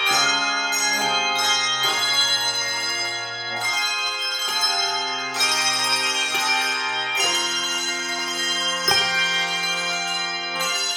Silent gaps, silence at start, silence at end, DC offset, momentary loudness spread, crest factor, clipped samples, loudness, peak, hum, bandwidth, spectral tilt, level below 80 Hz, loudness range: none; 0 s; 0 s; under 0.1%; 6 LU; 18 dB; under 0.1%; -20 LUFS; -4 dBFS; none; 18 kHz; 0.5 dB/octave; -66 dBFS; 1 LU